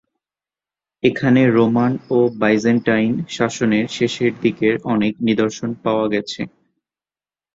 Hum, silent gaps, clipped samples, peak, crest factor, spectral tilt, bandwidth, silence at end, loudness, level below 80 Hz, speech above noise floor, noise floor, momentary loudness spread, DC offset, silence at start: none; none; under 0.1%; -2 dBFS; 16 dB; -6 dB/octave; 7.8 kHz; 1.1 s; -18 LUFS; -56 dBFS; over 73 dB; under -90 dBFS; 7 LU; under 0.1%; 1.05 s